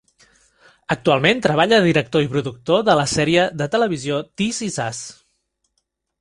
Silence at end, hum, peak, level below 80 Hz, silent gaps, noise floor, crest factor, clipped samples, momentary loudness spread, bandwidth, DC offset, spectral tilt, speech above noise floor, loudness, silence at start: 1.1 s; none; 0 dBFS; -52 dBFS; none; -73 dBFS; 20 dB; under 0.1%; 10 LU; 11.5 kHz; under 0.1%; -4.5 dB/octave; 55 dB; -18 LUFS; 0.9 s